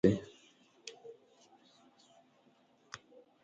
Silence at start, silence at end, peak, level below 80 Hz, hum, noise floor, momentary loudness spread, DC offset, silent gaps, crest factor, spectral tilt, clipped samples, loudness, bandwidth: 0.05 s; 2.3 s; -14 dBFS; -64 dBFS; none; -69 dBFS; 21 LU; under 0.1%; none; 26 dB; -7 dB/octave; under 0.1%; -41 LUFS; 8 kHz